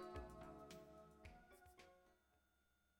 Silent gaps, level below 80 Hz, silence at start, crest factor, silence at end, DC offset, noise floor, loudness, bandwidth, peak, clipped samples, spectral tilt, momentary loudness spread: none; -68 dBFS; 0 s; 18 dB; 0 s; under 0.1%; -83 dBFS; -61 LUFS; 18 kHz; -42 dBFS; under 0.1%; -5.5 dB/octave; 12 LU